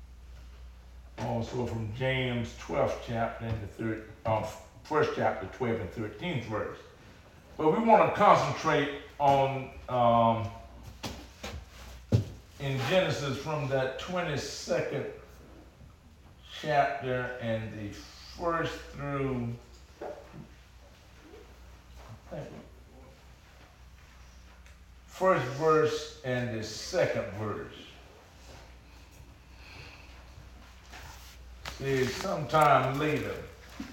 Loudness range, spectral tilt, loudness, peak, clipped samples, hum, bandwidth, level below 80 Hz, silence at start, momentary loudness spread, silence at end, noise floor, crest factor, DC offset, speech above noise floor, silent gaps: 22 LU; -5.5 dB/octave; -30 LUFS; -6 dBFS; under 0.1%; none; 17 kHz; -52 dBFS; 0 s; 24 LU; 0 s; -55 dBFS; 26 dB; under 0.1%; 25 dB; none